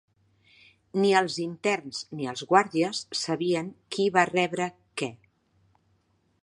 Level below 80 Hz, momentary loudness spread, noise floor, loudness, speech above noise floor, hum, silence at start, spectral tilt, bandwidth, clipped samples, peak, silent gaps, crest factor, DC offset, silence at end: -72 dBFS; 11 LU; -69 dBFS; -27 LUFS; 43 dB; none; 0.95 s; -4.5 dB/octave; 11.5 kHz; under 0.1%; -4 dBFS; none; 24 dB; under 0.1%; 1.25 s